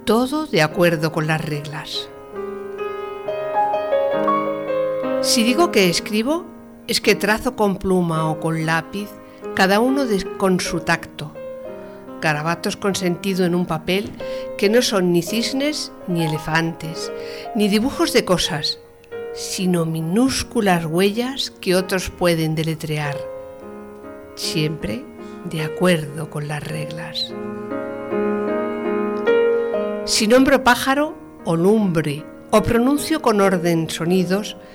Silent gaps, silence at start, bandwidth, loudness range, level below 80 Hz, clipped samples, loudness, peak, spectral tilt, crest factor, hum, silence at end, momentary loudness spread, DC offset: none; 0 s; 20 kHz; 6 LU; -46 dBFS; under 0.1%; -20 LUFS; -6 dBFS; -4.5 dB/octave; 14 dB; none; 0 s; 14 LU; under 0.1%